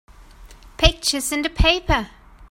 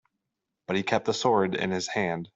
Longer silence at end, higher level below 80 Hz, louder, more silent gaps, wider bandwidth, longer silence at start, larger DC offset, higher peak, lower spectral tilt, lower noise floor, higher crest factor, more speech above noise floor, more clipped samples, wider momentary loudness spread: about the same, 0.05 s vs 0.1 s; first, -26 dBFS vs -66 dBFS; first, -19 LUFS vs -27 LUFS; neither; first, 16.5 kHz vs 8 kHz; second, 0.4 s vs 0.7 s; neither; first, 0 dBFS vs -10 dBFS; about the same, -3.5 dB/octave vs -4.5 dB/octave; second, -44 dBFS vs -84 dBFS; about the same, 22 dB vs 18 dB; second, 24 dB vs 58 dB; neither; about the same, 6 LU vs 6 LU